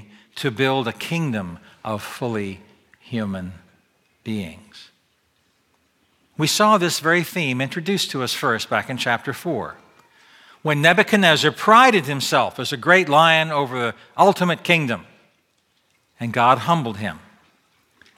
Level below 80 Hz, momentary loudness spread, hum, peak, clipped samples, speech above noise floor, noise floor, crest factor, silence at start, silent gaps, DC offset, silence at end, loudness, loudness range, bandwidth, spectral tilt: -64 dBFS; 16 LU; none; 0 dBFS; under 0.1%; 46 dB; -66 dBFS; 20 dB; 0.35 s; none; under 0.1%; 1 s; -19 LUFS; 15 LU; 17 kHz; -4 dB/octave